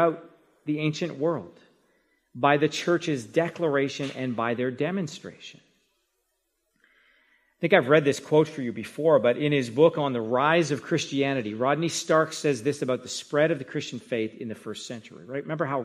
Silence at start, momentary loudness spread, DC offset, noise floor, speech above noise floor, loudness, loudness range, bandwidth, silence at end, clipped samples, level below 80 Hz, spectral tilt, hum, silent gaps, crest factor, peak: 0 s; 14 LU; under 0.1%; -76 dBFS; 51 dB; -25 LUFS; 7 LU; 14 kHz; 0 s; under 0.1%; -72 dBFS; -5.5 dB/octave; none; none; 22 dB; -4 dBFS